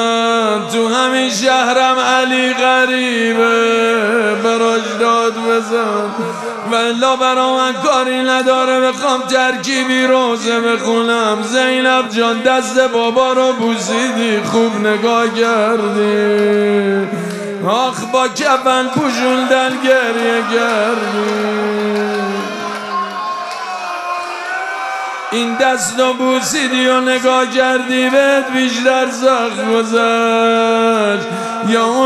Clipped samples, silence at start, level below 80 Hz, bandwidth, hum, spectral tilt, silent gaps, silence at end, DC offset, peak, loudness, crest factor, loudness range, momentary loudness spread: under 0.1%; 0 s; -66 dBFS; 14 kHz; none; -3.5 dB/octave; none; 0 s; under 0.1%; 0 dBFS; -14 LUFS; 14 dB; 4 LU; 8 LU